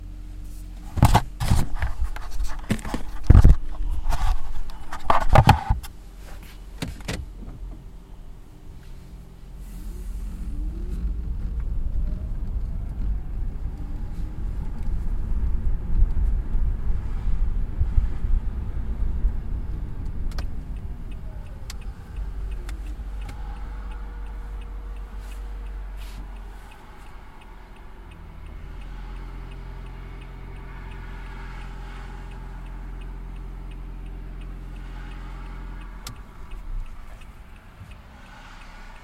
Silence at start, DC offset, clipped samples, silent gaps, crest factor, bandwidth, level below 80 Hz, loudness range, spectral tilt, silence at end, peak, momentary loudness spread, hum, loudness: 0 s; under 0.1%; under 0.1%; none; 24 dB; 14.5 kHz; -28 dBFS; 17 LU; -6.5 dB/octave; 0 s; 0 dBFS; 19 LU; none; -29 LUFS